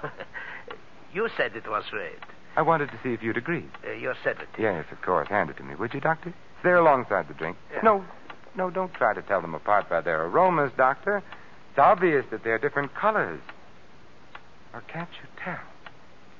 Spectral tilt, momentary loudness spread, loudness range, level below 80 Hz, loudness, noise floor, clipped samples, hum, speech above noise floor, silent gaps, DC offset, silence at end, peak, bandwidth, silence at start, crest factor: -7.5 dB/octave; 18 LU; 6 LU; -62 dBFS; -26 LUFS; -53 dBFS; under 0.1%; none; 27 dB; none; 0.6%; 0.7 s; -6 dBFS; 7.2 kHz; 0 s; 20 dB